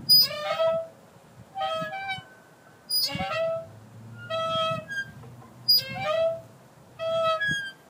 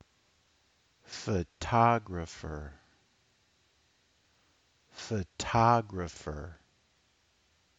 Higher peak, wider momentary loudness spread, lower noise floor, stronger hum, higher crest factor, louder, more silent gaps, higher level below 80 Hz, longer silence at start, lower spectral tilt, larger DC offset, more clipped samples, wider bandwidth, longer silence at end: about the same, -10 dBFS vs -12 dBFS; about the same, 18 LU vs 20 LU; second, -53 dBFS vs -71 dBFS; neither; second, 18 dB vs 24 dB; first, -26 LUFS vs -31 LUFS; neither; second, -62 dBFS vs -54 dBFS; second, 0 s vs 1.1 s; second, -2 dB/octave vs -6 dB/octave; neither; neither; first, 16 kHz vs 8 kHz; second, 0.15 s vs 1.25 s